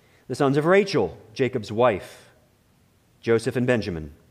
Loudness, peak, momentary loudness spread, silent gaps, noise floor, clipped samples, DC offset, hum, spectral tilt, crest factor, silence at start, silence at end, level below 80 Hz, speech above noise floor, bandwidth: -23 LUFS; -6 dBFS; 14 LU; none; -61 dBFS; under 0.1%; under 0.1%; none; -6.5 dB/octave; 18 dB; 0.3 s; 0.2 s; -54 dBFS; 38 dB; 14.5 kHz